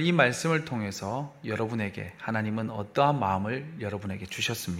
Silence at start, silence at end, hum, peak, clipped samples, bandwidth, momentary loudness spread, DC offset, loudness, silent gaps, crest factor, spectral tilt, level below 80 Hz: 0 s; 0 s; none; -6 dBFS; under 0.1%; 16 kHz; 11 LU; under 0.1%; -29 LUFS; none; 24 dB; -5 dB/octave; -62 dBFS